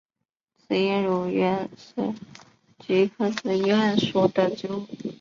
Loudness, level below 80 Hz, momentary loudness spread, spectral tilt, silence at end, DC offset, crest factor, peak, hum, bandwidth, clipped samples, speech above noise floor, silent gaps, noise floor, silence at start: -24 LUFS; -66 dBFS; 11 LU; -6.5 dB/octave; 0.05 s; under 0.1%; 18 dB; -6 dBFS; none; 7.4 kHz; under 0.1%; 60 dB; none; -84 dBFS; 0.7 s